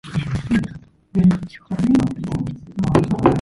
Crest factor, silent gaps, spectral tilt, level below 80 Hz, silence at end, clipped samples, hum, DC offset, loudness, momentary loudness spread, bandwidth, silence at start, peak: 18 dB; none; -8 dB/octave; -40 dBFS; 0 s; under 0.1%; none; under 0.1%; -20 LUFS; 9 LU; 11.5 kHz; 0.05 s; 0 dBFS